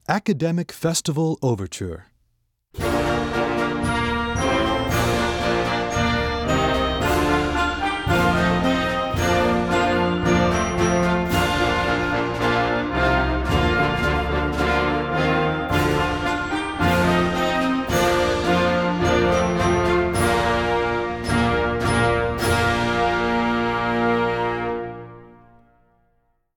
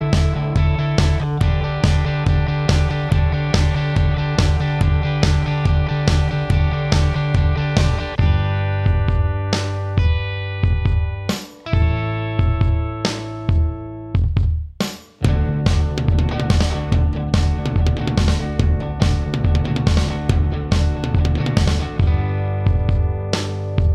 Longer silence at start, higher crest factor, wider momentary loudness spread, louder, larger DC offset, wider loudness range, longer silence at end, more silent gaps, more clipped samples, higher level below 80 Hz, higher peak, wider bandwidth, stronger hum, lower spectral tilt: about the same, 0.1 s vs 0 s; about the same, 18 dB vs 18 dB; about the same, 4 LU vs 4 LU; about the same, -21 LUFS vs -19 LUFS; neither; about the same, 4 LU vs 3 LU; first, 1.3 s vs 0 s; neither; neither; second, -34 dBFS vs -22 dBFS; second, -4 dBFS vs 0 dBFS; first, 18 kHz vs 11.5 kHz; neither; about the same, -5.5 dB/octave vs -6.5 dB/octave